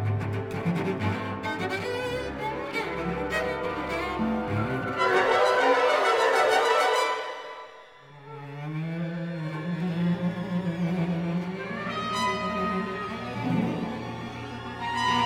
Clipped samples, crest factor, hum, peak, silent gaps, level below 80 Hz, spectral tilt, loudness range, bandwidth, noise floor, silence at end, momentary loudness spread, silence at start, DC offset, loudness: under 0.1%; 18 dB; none; -10 dBFS; none; -52 dBFS; -5.5 dB/octave; 8 LU; 15.5 kHz; -49 dBFS; 0 s; 13 LU; 0 s; under 0.1%; -27 LUFS